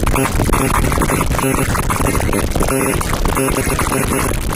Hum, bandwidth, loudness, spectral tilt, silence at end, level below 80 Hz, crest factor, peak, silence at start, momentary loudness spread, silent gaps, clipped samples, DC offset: none; 16.5 kHz; -16 LUFS; -4.5 dB/octave; 0 s; -22 dBFS; 14 dB; -2 dBFS; 0 s; 2 LU; none; under 0.1%; under 0.1%